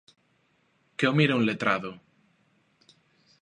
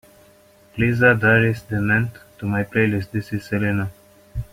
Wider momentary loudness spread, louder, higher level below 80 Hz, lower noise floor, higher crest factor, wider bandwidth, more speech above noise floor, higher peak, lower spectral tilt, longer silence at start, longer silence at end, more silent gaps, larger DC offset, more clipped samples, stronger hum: about the same, 16 LU vs 16 LU; second, -25 LUFS vs -20 LUFS; second, -72 dBFS vs -44 dBFS; first, -69 dBFS vs -52 dBFS; about the same, 22 dB vs 18 dB; second, 10.5 kHz vs 16 kHz; first, 44 dB vs 33 dB; second, -8 dBFS vs -2 dBFS; second, -6.5 dB/octave vs -8 dB/octave; first, 1 s vs 0.75 s; first, 1.45 s vs 0.1 s; neither; neither; neither; neither